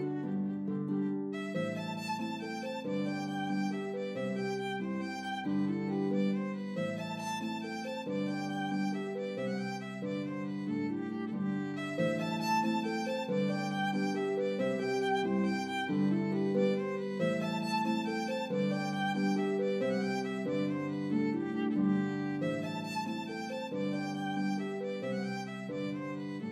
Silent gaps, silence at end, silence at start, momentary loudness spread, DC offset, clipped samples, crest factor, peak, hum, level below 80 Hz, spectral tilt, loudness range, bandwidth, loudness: none; 0 s; 0 s; 7 LU; under 0.1%; under 0.1%; 16 dB; -18 dBFS; none; -84 dBFS; -6.5 dB/octave; 4 LU; 13 kHz; -34 LUFS